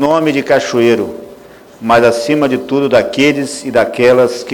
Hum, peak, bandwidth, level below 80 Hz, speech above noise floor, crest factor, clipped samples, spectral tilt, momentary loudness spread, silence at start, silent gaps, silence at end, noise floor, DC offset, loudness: none; 0 dBFS; 20 kHz; -48 dBFS; 25 dB; 12 dB; 0.1%; -5 dB/octave; 7 LU; 0 s; none; 0 s; -37 dBFS; under 0.1%; -12 LUFS